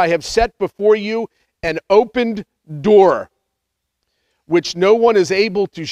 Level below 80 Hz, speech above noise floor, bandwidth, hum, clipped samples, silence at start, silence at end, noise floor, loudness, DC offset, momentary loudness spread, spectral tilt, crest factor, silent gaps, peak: -42 dBFS; 61 dB; 10.5 kHz; none; under 0.1%; 0 s; 0 s; -76 dBFS; -16 LUFS; under 0.1%; 12 LU; -5 dB/octave; 16 dB; none; 0 dBFS